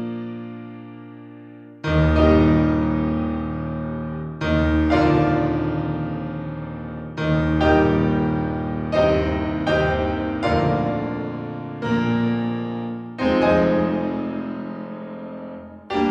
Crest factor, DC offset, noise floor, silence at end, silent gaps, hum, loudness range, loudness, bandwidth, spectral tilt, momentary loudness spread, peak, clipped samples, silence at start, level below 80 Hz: 16 dB; under 0.1%; -41 dBFS; 0 s; none; none; 3 LU; -21 LUFS; 7.8 kHz; -8.5 dB/octave; 17 LU; -4 dBFS; under 0.1%; 0 s; -36 dBFS